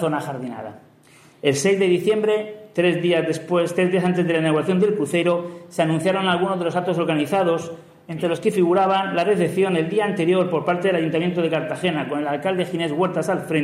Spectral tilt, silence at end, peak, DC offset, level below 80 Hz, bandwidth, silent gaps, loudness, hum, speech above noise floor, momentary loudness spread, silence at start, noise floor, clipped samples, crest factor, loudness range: -6 dB/octave; 0 s; -4 dBFS; under 0.1%; -68 dBFS; 13.5 kHz; none; -21 LUFS; none; 31 dB; 7 LU; 0 s; -51 dBFS; under 0.1%; 16 dB; 2 LU